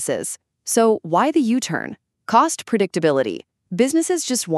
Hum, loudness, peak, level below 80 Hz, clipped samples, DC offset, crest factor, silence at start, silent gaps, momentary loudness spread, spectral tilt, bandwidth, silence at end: none; -19 LUFS; -2 dBFS; -70 dBFS; under 0.1%; under 0.1%; 18 dB; 0 s; none; 14 LU; -4 dB/octave; 13.5 kHz; 0 s